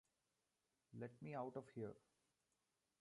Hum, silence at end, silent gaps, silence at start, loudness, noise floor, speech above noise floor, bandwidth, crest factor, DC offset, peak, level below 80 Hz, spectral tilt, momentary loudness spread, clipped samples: none; 1 s; none; 0.9 s; -53 LUFS; -90 dBFS; 38 dB; 11 kHz; 20 dB; under 0.1%; -36 dBFS; -88 dBFS; -8.5 dB/octave; 11 LU; under 0.1%